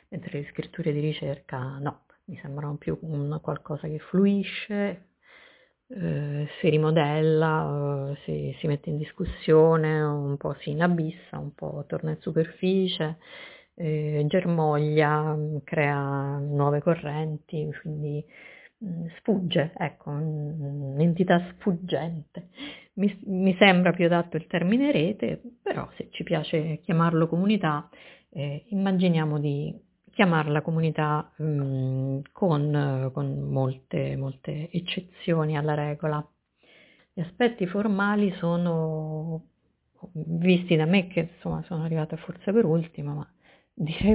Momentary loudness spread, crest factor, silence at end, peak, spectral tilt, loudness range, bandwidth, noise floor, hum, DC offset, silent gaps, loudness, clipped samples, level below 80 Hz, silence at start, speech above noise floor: 13 LU; 22 dB; 0 s; -4 dBFS; -11 dB/octave; 5 LU; 4 kHz; -67 dBFS; none; under 0.1%; none; -26 LUFS; under 0.1%; -56 dBFS; 0.1 s; 41 dB